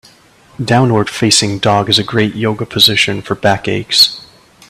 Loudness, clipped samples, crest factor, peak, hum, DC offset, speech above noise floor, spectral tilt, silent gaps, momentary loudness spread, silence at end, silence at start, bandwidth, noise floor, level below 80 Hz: -11 LUFS; 0.1%; 14 dB; 0 dBFS; none; under 0.1%; 32 dB; -3.5 dB/octave; none; 8 LU; 0.45 s; 0.6 s; over 20 kHz; -45 dBFS; -46 dBFS